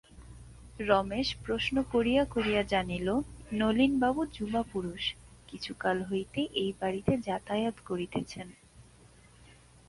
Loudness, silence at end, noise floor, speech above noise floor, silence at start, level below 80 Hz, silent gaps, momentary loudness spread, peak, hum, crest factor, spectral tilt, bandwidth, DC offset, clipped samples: -31 LUFS; 1.05 s; -57 dBFS; 27 dB; 0.15 s; -52 dBFS; none; 15 LU; -10 dBFS; none; 22 dB; -5.5 dB/octave; 11.5 kHz; under 0.1%; under 0.1%